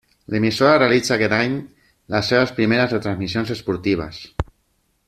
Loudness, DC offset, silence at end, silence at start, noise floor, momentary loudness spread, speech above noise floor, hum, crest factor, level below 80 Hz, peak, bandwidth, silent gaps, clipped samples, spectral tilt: -19 LUFS; under 0.1%; 0.65 s; 0.3 s; -66 dBFS; 14 LU; 47 dB; none; 18 dB; -44 dBFS; -2 dBFS; 14 kHz; none; under 0.1%; -5.5 dB/octave